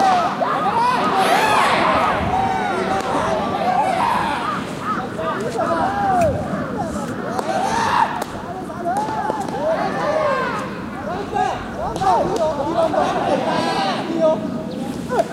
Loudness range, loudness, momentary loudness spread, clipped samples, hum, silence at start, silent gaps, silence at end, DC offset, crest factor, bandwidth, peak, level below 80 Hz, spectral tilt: 4 LU; -20 LUFS; 9 LU; under 0.1%; none; 0 s; none; 0 s; under 0.1%; 16 dB; 16 kHz; -2 dBFS; -44 dBFS; -5 dB/octave